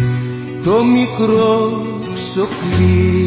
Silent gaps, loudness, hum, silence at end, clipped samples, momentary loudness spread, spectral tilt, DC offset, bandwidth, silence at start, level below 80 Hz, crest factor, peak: none; -15 LUFS; none; 0 s; under 0.1%; 10 LU; -12 dB/octave; under 0.1%; 4 kHz; 0 s; -30 dBFS; 12 dB; -2 dBFS